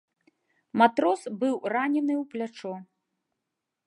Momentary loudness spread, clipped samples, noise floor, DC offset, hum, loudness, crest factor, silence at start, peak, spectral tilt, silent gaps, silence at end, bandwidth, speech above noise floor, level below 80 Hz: 15 LU; under 0.1%; -84 dBFS; under 0.1%; none; -26 LUFS; 24 dB; 0.75 s; -4 dBFS; -5.5 dB/octave; none; 1.05 s; 11 kHz; 58 dB; -82 dBFS